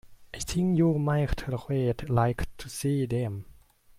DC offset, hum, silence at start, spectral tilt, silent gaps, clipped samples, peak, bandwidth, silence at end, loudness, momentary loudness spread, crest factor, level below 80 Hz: under 0.1%; none; 0.05 s; -6.5 dB/octave; none; under 0.1%; -12 dBFS; 15.5 kHz; 0.55 s; -28 LUFS; 12 LU; 16 dB; -42 dBFS